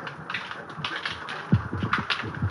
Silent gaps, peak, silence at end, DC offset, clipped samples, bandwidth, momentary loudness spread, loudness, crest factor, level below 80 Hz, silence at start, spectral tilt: none; -8 dBFS; 0 s; under 0.1%; under 0.1%; 11 kHz; 7 LU; -29 LUFS; 20 dB; -52 dBFS; 0 s; -6 dB/octave